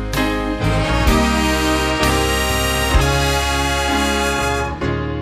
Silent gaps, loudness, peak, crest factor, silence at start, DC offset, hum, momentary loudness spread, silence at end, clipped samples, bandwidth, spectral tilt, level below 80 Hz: none; -17 LUFS; -2 dBFS; 14 dB; 0 s; under 0.1%; none; 4 LU; 0 s; under 0.1%; 15.5 kHz; -4 dB/octave; -24 dBFS